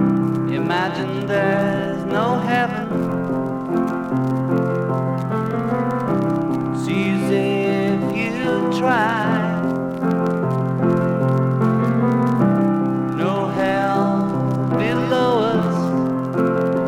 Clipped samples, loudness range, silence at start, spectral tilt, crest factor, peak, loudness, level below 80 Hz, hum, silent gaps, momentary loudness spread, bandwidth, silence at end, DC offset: under 0.1%; 2 LU; 0 s; -8 dB/octave; 14 dB; -4 dBFS; -20 LUFS; -56 dBFS; none; none; 4 LU; 13.5 kHz; 0 s; under 0.1%